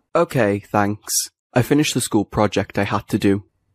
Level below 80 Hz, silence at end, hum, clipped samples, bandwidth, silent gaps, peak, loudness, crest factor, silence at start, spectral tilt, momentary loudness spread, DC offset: -48 dBFS; 0.3 s; none; under 0.1%; 15.5 kHz; 1.39-1.50 s; -2 dBFS; -20 LUFS; 18 dB; 0.15 s; -4.5 dB/octave; 4 LU; under 0.1%